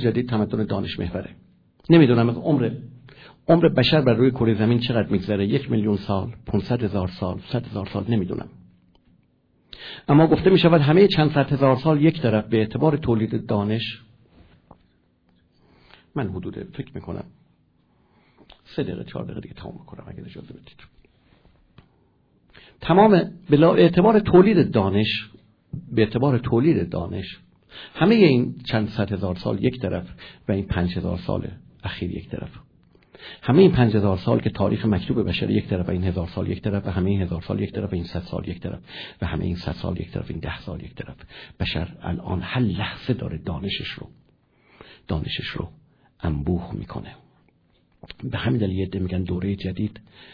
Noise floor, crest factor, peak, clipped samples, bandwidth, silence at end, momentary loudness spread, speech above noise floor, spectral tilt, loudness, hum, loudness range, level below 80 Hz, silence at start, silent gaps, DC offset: -63 dBFS; 20 dB; -2 dBFS; under 0.1%; 5.4 kHz; 0.35 s; 20 LU; 41 dB; -9.5 dB/octave; -22 LUFS; none; 17 LU; -44 dBFS; 0 s; none; under 0.1%